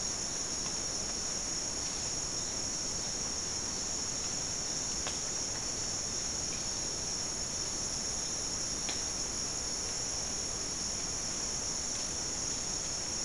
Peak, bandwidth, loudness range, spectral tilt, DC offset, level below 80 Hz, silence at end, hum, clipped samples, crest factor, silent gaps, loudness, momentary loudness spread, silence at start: -20 dBFS; 12 kHz; 0 LU; -1 dB/octave; 0.2%; -52 dBFS; 0 s; none; under 0.1%; 16 dB; none; -33 LUFS; 1 LU; 0 s